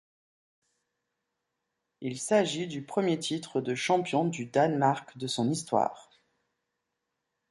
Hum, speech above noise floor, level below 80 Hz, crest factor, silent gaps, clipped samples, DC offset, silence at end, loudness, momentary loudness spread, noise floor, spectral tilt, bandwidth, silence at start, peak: none; 55 dB; -76 dBFS; 20 dB; none; under 0.1%; under 0.1%; 1.5 s; -29 LUFS; 8 LU; -84 dBFS; -5 dB/octave; 11.5 kHz; 2 s; -12 dBFS